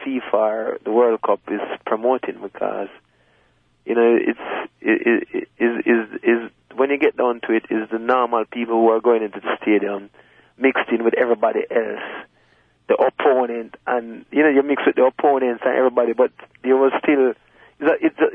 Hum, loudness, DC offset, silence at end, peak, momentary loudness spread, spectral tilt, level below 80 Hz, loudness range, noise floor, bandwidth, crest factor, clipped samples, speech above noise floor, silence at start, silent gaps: none; -19 LUFS; under 0.1%; 0 s; -4 dBFS; 10 LU; -8 dB/octave; -68 dBFS; 4 LU; -60 dBFS; 3.7 kHz; 14 dB; under 0.1%; 41 dB; 0 s; none